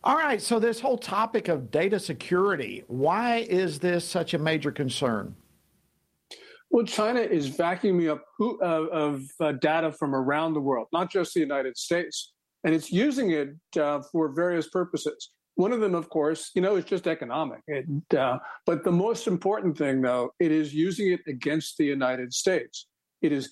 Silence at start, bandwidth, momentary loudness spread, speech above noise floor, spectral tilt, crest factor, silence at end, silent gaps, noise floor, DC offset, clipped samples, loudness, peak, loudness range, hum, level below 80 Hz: 0.05 s; 13.5 kHz; 6 LU; 46 dB; -5.5 dB/octave; 18 dB; 0 s; none; -72 dBFS; under 0.1%; under 0.1%; -27 LUFS; -8 dBFS; 2 LU; none; -70 dBFS